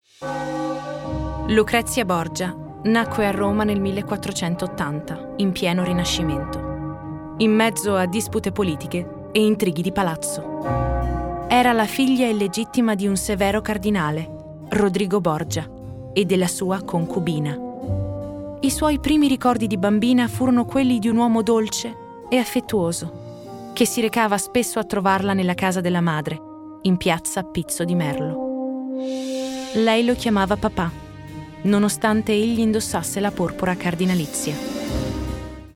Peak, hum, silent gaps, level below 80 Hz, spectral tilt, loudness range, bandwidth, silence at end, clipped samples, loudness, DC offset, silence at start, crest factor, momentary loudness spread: -6 dBFS; none; none; -40 dBFS; -5 dB/octave; 3 LU; 17.5 kHz; 0.05 s; under 0.1%; -21 LUFS; under 0.1%; 0.2 s; 16 dB; 10 LU